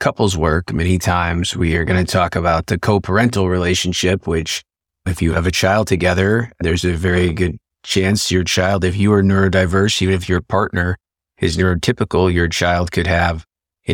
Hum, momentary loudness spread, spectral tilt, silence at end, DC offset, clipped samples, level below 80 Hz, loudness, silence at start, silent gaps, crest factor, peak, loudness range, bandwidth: none; 6 LU; -5 dB/octave; 0 s; under 0.1%; under 0.1%; -32 dBFS; -17 LUFS; 0 s; none; 16 dB; -2 dBFS; 2 LU; 17 kHz